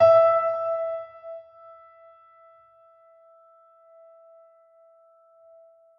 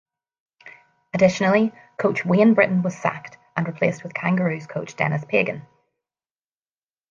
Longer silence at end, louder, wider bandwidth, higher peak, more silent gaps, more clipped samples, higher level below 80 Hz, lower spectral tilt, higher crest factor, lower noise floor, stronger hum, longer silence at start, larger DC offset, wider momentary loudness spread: first, 4.55 s vs 1.5 s; about the same, -22 LUFS vs -21 LUFS; second, 5.8 kHz vs 7.4 kHz; about the same, -6 dBFS vs -4 dBFS; neither; neither; second, -76 dBFS vs -66 dBFS; about the same, -6 dB/octave vs -7 dB/octave; about the same, 20 dB vs 20 dB; second, -57 dBFS vs under -90 dBFS; neither; second, 0 s vs 0.65 s; neither; first, 31 LU vs 13 LU